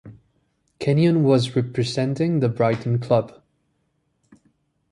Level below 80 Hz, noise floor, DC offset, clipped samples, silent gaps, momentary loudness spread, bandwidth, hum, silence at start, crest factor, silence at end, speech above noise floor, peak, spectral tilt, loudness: -58 dBFS; -70 dBFS; under 0.1%; under 0.1%; none; 6 LU; 11.5 kHz; none; 0.05 s; 18 dB; 1.6 s; 50 dB; -4 dBFS; -7.5 dB/octave; -21 LUFS